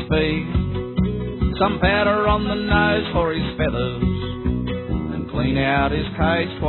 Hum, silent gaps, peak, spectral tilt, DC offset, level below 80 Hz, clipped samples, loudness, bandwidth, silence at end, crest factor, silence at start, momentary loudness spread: none; none; -4 dBFS; -10.5 dB/octave; under 0.1%; -30 dBFS; under 0.1%; -21 LUFS; 4.3 kHz; 0 s; 18 dB; 0 s; 7 LU